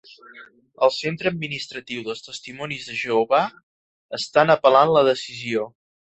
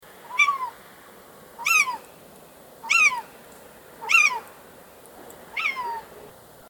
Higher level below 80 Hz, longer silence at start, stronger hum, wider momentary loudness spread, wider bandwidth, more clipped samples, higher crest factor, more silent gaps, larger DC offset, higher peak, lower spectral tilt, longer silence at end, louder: about the same, -64 dBFS vs -68 dBFS; about the same, 0.3 s vs 0.25 s; neither; second, 16 LU vs 20 LU; second, 8.2 kHz vs 19 kHz; neither; about the same, 20 dB vs 20 dB; first, 3.63-4.09 s vs none; neither; first, -2 dBFS vs -6 dBFS; first, -4.5 dB/octave vs 1 dB/octave; about the same, 0.45 s vs 0.4 s; about the same, -21 LUFS vs -21 LUFS